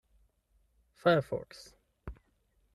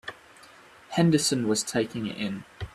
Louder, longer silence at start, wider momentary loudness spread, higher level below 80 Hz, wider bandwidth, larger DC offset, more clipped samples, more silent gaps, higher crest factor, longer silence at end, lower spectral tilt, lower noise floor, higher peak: second, -31 LUFS vs -26 LUFS; first, 1.05 s vs 0.05 s; first, 23 LU vs 13 LU; about the same, -58 dBFS vs -58 dBFS; about the same, 13 kHz vs 14 kHz; neither; neither; neither; about the same, 22 dB vs 18 dB; first, 0.6 s vs 0.05 s; first, -6.5 dB/octave vs -4.5 dB/octave; first, -73 dBFS vs -52 dBFS; second, -14 dBFS vs -10 dBFS